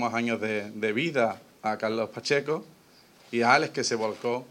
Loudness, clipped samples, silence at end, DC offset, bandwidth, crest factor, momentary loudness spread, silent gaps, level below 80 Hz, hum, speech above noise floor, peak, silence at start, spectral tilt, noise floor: -27 LUFS; under 0.1%; 0.05 s; under 0.1%; 16.5 kHz; 20 dB; 10 LU; none; -80 dBFS; none; 29 dB; -8 dBFS; 0 s; -4 dB/octave; -57 dBFS